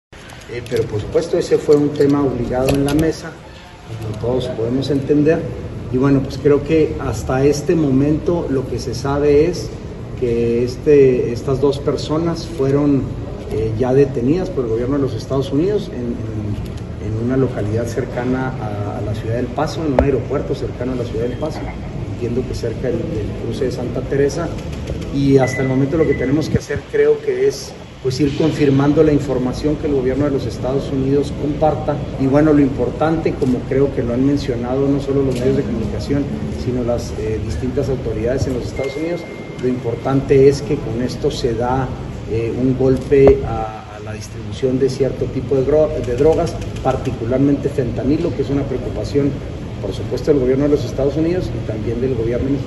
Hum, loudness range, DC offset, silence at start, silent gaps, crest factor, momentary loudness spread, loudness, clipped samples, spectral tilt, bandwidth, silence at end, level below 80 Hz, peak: none; 4 LU; under 0.1%; 0.1 s; none; 18 dB; 10 LU; -18 LUFS; under 0.1%; -7.5 dB/octave; 12.5 kHz; 0 s; -32 dBFS; 0 dBFS